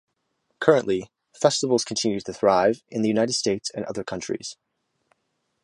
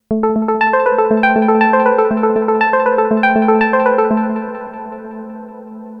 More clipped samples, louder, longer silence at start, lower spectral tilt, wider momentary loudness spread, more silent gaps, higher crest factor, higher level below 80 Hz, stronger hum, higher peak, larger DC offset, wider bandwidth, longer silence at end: neither; second, -23 LUFS vs -13 LUFS; first, 0.6 s vs 0.1 s; second, -4 dB/octave vs -8.5 dB/octave; second, 11 LU vs 18 LU; neither; first, 22 dB vs 14 dB; second, -62 dBFS vs -52 dBFS; neither; about the same, -2 dBFS vs 0 dBFS; neither; first, 11.5 kHz vs 5.6 kHz; first, 1.1 s vs 0 s